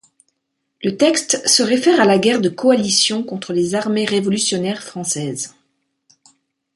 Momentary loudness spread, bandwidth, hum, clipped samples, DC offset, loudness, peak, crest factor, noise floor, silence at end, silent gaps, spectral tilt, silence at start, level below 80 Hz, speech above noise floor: 11 LU; 12 kHz; none; under 0.1%; under 0.1%; -16 LUFS; -2 dBFS; 18 dB; -74 dBFS; 1.25 s; none; -3 dB/octave; 0.8 s; -64 dBFS; 57 dB